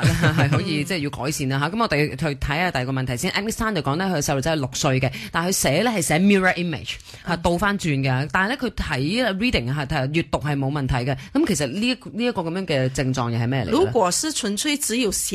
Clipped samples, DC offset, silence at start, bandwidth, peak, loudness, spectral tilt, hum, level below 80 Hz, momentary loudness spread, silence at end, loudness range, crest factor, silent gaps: under 0.1%; under 0.1%; 0 s; 13.5 kHz; -4 dBFS; -22 LUFS; -4.5 dB/octave; none; -40 dBFS; 6 LU; 0 s; 2 LU; 18 dB; none